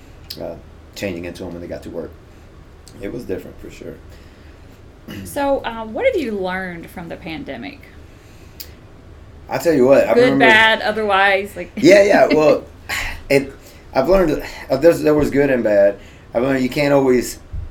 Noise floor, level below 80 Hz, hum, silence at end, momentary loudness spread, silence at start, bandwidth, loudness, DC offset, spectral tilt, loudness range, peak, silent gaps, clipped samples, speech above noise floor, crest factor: -41 dBFS; -38 dBFS; none; 0 s; 23 LU; 0.2 s; 18.5 kHz; -15 LUFS; under 0.1%; -5 dB/octave; 18 LU; 0 dBFS; none; under 0.1%; 25 dB; 18 dB